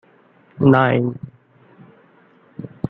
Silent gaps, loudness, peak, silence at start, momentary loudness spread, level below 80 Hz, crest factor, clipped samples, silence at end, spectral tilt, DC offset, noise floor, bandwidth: none; -16 LUFS; -2 dBFS; 0.6 s; 25 LU; -58 dBFS; 20 dB; under 0.1%; 0 s; -10.5 dB/octave; under 0.1%; -53 dBFS; 4.1 kHz